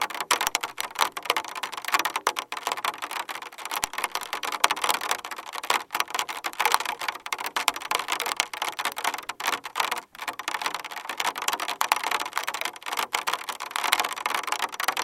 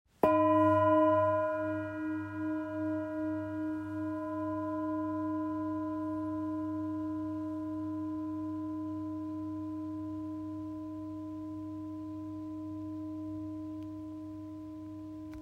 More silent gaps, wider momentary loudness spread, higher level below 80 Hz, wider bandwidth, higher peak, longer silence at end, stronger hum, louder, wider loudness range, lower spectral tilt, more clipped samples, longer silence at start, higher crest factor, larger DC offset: neither; second, 8 LU vs 15 LU; about the same, -70 dBFS vs -66 dBFS; first, 17 kHz vs 5.2 kHz; first, 0 dBFS vs -12 dBFS; about the same, 0 s vs 0 s; neither; first, -27 LUFS vs -35 LUFS; second, 2 LU vs 10 LU; second, 1 dB/octave vs -9 dB/octave; neither; second, 0 s vs 0.25 s; first, 28 dB vs 22 dB; neither